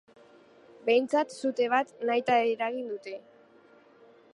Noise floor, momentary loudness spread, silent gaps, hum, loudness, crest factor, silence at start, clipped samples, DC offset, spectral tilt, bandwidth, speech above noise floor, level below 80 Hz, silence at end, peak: -58 dBFS; 13 LU; none; none; -28 LUFS; 18 dB; 0.85 s; under 0.1%; under 0.1%; -4 dB/octave; 11 kHz; 30 dB; -82 dBFS; 1.15 s; -12 dBFS